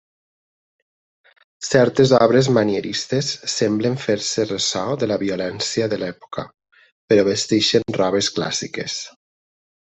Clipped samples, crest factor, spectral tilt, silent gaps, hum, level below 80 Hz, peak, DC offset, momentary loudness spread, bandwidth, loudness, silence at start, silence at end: under 0.1%; 18 dB; -4.5 dB/octave; 6.92-7.08 s; none; -58 dBFS; -2 dBFS; under 0.1%; 13 LU; 8.4 kHz; -19 LUFS; 1.6 s; 0.85 s